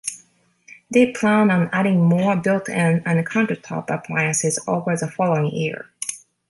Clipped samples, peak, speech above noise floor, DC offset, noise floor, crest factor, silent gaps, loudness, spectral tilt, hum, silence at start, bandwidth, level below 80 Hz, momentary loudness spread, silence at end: under 0.1%; -4 dBFS; 37 dB; under 0.1%; -57 dBFS; 16 dB; none; -20 LUFS; -5.5 dB/octave; none; 0.05 s; 11.5 kHz; -64 dBFS; 10 LU; 0.35 s